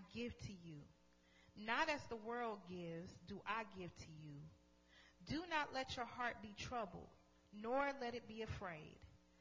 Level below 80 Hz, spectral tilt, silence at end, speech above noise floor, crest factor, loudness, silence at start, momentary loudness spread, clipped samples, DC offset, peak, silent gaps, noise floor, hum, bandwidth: -68 dBFS; -4.5 dB/octave; 0.2 s; 24 dB; 22 dB; -47 LUFS; 0 s; 19 LU; under 0.1%; under 0.1%; -26 dBFS; none; -71 dBFS; none; 7.6 kHz